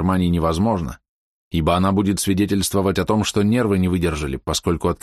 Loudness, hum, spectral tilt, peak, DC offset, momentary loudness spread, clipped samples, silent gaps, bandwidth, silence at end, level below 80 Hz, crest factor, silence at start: -20 LUFS; none; -5.5 dB/octave; -4 dBFS; under 0.1%; 5 LU; under 0.1%; 1.08-1.51 s; 13 kHz; 0.05 s; -36 dBFS; 14 dB; 0 s